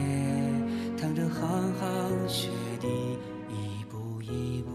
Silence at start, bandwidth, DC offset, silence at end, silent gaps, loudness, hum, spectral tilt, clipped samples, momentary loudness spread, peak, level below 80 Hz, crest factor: 0 s; 13.5 kHz; under 0.1%; 0 s; none; -32 LUFS; none; -6 dB/octave; under 0.1%; 9 LU; -16 dBFS; -58 dBFS; 14 dB